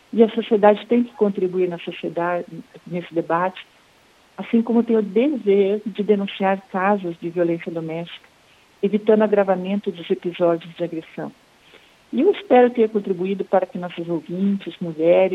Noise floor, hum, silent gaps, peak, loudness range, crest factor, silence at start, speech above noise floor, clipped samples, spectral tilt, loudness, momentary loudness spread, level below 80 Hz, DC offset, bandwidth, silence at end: -54 dBFS; none; none; 0 dBFS; 3 LU; 20 dB; 0.15 s; 35 dB; under 0.1%; -8.5 dB/octave; -21 LUFS; 13 LU; -70 dBFS; under 0.1%; 7.4 kHz; 0 s